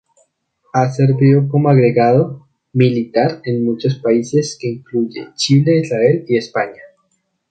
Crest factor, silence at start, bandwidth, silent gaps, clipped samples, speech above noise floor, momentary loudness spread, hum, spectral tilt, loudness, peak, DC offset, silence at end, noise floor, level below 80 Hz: 14 dB; 0.75 s; 9 kHz; none; under 0.1%; 51 dB; 10 LU; none; -7 dB/octave; -15 LUFS; 0 dBFS; under 0.1%; 0.65 s; -66 dBFS; -58 dBFS